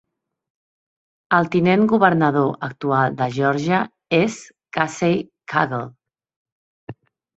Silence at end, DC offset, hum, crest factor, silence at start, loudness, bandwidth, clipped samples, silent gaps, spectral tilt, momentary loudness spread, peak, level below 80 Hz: 0.45 s; under 0.1%; none; 20 dB; 1.3 s; -19 LUFS; 8.2 kHz; under 0.1%; 6.36-6.45 s, 6.52-6.87 s; -6.5 dB/octave; 9 LU; -2 dBFS; -60 dBFS